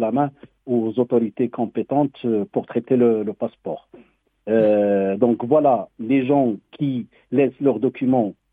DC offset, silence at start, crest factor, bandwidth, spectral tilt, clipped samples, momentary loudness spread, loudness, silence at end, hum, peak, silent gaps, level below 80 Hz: under 0.1%; 0 s; 16 dB; 3.8 kHz; -10.5 dB/octave; under 0.1%; 10 LU; -21 LUFS; 0.2 s; none; -4 dBFS; none; -66 dBFS